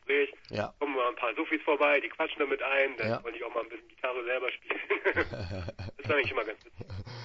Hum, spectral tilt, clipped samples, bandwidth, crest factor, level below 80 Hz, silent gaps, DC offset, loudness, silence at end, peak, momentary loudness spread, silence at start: none; -6.5 dB/octave; under 0.1%; 7.4 kHz; 20 dB; -58 dBFS; none; under 0.1%; -31 LUFS; 0 s; -12 dBFS; 13 LU; 0.05 s